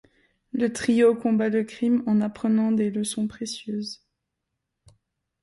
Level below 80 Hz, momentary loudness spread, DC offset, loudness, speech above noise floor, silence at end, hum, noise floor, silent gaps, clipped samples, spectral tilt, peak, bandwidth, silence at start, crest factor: -64 dBFS; 13 LU; under 0.1%; -24 LUFS; 58 dB; 1.45 s; none; -81 dBFS; none; under 0.1%; -5.5 dB/octave; -8 dBFS; 11.5 kHz; 0.55 s; 16 dB